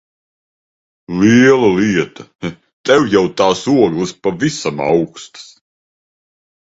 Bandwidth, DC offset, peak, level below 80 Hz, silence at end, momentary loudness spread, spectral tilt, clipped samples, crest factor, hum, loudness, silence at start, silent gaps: 8 kHz; under 0.1%; 0 dBFS; -50 dBFS; 1.35 s; 17 LU; -5.5 dB/octave; under 0.1%; 16 dB; none; -13 LUFS; 1.1 s; 2.73-2.84 s